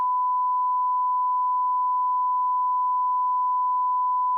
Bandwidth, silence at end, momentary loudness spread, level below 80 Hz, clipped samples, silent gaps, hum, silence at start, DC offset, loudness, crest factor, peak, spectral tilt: 1.1 kHz; 0 s; 0 LU; under -90 dBFS; under 0.1%; none; none; 0 s; under 0.1%; -23 LUFS; 4 dB; -20 dBFS; 8.5 dB/octave